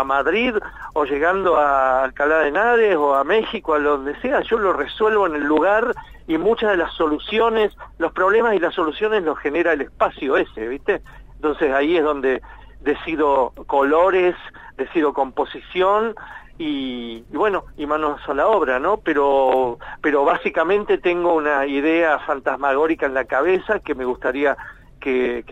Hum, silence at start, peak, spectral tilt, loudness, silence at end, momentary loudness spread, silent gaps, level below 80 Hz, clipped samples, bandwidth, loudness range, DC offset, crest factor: none; 0 s; -4 dBFS; -6 dB/octave; -19 LUFS; 0 s; 9 LU; none; -46 dBFS; under 0.1%; 8 kHz; 4 LU; under 0.1%; 16 dB